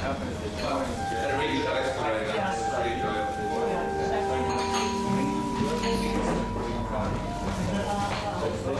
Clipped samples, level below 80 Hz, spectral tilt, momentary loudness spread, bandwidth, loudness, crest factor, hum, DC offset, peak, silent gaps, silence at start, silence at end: under 0.1%; -40 dBFS; -5 dB/octave; 4 LU; 12.5 kHz; -28 LUFS; 12 dB; none; under 0.1%; -14 dBFS; none; 0 s; 0 s